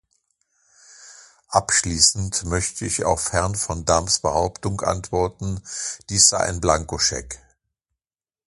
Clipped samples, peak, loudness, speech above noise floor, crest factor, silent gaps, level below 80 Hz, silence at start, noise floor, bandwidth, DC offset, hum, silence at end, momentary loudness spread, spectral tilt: under 0.1%; 0 dBFS; -20 LUFS; over 68 dB; 22 dB; none; -40 dBFS; 1 s; under -90 dBFS; 11.5 kHz; under 0.1%; none; 1.1 s; 13 LU; -2.5 dB/octave